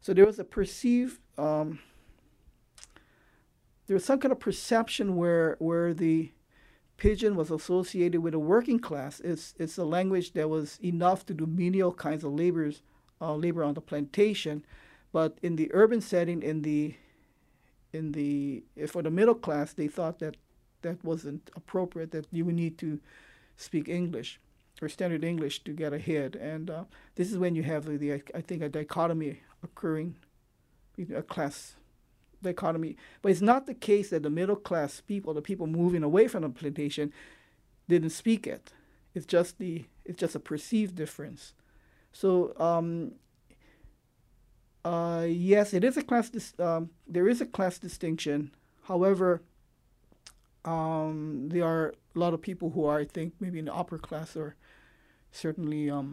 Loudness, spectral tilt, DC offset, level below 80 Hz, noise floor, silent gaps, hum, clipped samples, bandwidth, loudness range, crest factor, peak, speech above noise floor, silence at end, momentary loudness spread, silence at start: -30 LUFS; -6.5 dB/octave; under 0.1%; -54 dBFS; -67 dBFS; none; none; under 0.1%; 13.5 kHz; 6 LU; 22 dB; -8 dBFS; 38 dB; 0 s; 13 LU; 0.05 s